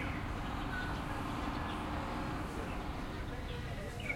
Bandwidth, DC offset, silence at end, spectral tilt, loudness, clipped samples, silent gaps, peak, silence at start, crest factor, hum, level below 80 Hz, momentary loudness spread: 16.5 kHz; under 0.1%; 0 s; -6 dB/octave; -40 LUFS; under 0.1%; none; -26 dBFS; 0 s; 14 dB; none; -46 dBFS; 3 LU